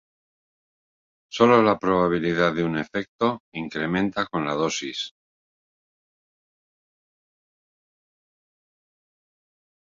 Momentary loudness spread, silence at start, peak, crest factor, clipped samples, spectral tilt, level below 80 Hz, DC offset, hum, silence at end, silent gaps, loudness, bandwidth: 14 LU; 1.3 s; -2 dBFS; 24 dB; under 0.1%; -5.5 dB/octave; -60 dBFS; under 0.1%; none; 4.9 s; 3.08-3.19 s, 3.40-3.52 s; -23 LUFS; 7.6 kHz